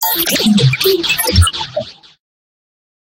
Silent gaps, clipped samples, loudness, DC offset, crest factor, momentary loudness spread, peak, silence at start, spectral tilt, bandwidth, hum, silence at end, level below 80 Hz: none; under 0.1%; -12 LUFS; under 0.1%; 16 dB; 12 LU; 0 dBFS; 0 s; -4 dB/octave; 17 kHz; none; 1.25 s; -28 dBFS